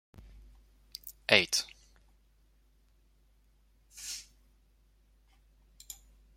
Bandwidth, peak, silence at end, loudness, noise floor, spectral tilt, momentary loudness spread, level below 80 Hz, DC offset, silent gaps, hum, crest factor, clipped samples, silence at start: 16.5 kHz; -4 dBFS; 0.4 s; -29 LUFS; -66 dBFS; -1.5 dB/octave; 25 LU; -62 dBFS; under 0.1%; none; none; 34 dB; under 0.1%; 1.05 s